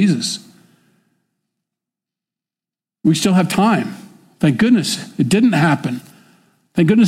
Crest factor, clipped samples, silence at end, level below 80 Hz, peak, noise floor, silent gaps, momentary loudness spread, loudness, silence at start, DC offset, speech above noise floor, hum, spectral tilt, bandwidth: 14 dB; under 0.1%; 0 s; -56 dBFS; -4 dBFS; -90 dBFS; none; 13 LU; -16 LUFS; 0 s; under 0.1%; 75 dB; none; -5.5 dB/octave; 15.5 kHz